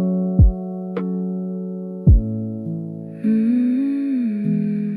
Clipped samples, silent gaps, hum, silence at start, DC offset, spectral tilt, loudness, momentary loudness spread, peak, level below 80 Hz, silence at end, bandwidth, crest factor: under 0.1%; none; none; 0 s; under 0.1%; -12 dB/octave; -21 LUFS; 12 LU; -4 dBFS; -24 dBFS; 0 s; 4.4 kHz; 14 dB